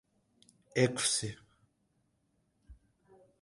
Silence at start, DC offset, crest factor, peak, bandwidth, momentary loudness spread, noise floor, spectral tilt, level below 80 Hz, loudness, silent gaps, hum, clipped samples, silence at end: 0.75 s; under 0.1%; 24 dB; -14 dBFS; 12 kHz; 16 LU; -76 dBFS; -3.5 dB/octave; -66 dBFS; -32 LUFS; none; none; under 0.1%; 0.65 s